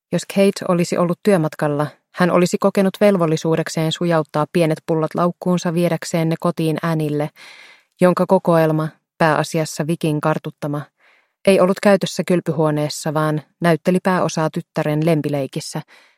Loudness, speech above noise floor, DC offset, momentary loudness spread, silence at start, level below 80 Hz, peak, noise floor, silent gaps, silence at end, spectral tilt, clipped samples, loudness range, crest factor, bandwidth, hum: -18 LUFS; 40 dB; under 0.1%; 8 LU; 0.1 s; -62 dBFS; 0 dBFS; -57 dBFS; none; 0.35 s; -6 dB/octave; under 0.1%; 2 LU; 18 dB; 15.5 kHz; none